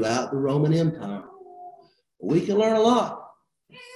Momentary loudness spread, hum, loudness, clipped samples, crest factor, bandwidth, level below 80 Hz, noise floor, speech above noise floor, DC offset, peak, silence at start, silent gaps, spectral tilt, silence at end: 22 LU; none; -23 LUFS; under 0.1%; 16 dB; 11.5 kHz; -62 dBFS; -54 dBFS; 32 dB; under 0.1%; -8 dBFS; 0 s; none; -6.5 dB/octave; 0 s